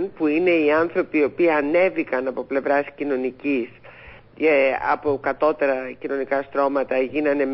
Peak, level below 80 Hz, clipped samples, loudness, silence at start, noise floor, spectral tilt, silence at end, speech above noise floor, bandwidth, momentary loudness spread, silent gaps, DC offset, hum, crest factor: -8 dBFS; -60 dBFS; under 0.1%; -21 LUFS; 0 s; -44 dBFS; -10 dB/octave; 0 s; 23 dB; 5.8 kHz; 7 LU; none; under 0.1%; none; 14 dB